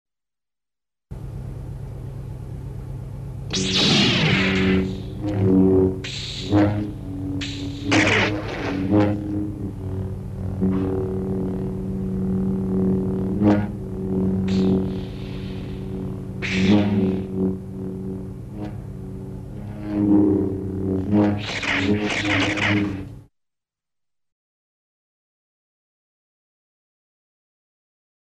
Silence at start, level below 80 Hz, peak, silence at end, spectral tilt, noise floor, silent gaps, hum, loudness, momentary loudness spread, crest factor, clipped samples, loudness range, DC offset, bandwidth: 1.1 s; -40 dBFS; -6 dBFS; 5 s; -6 dB/octave; under -90 dBFS; none; none; -22 LUFS; 16 LU; 16 dB; under 0.1%; 6 LU; under 0.1%; 10.5 kHz